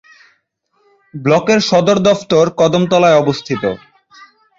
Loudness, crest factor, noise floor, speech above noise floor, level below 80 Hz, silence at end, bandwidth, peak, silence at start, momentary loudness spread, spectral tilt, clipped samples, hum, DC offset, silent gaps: -13 LUFS; 14 dB; -62 dBFS; 50 dB; -52 dBFS; 0.8 s; 7.8 kHz; -2 dBFS; 1.15 s; 10 LU; -5.5 dB/octave; under 0.1%; none; under 0.1%; none